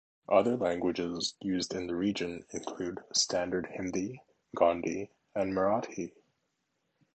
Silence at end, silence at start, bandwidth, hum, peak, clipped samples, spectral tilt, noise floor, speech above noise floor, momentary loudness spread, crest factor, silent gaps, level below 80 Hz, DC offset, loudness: 1.05 s; 0.3 s; 9 kHz; none; -10 dBFS; under 0.1%; -4 dB/octave; -80 dBFS; 48 dB; 12 LU; 22 dB; none; -64 dBFS; under 0.1%; -32 LUFS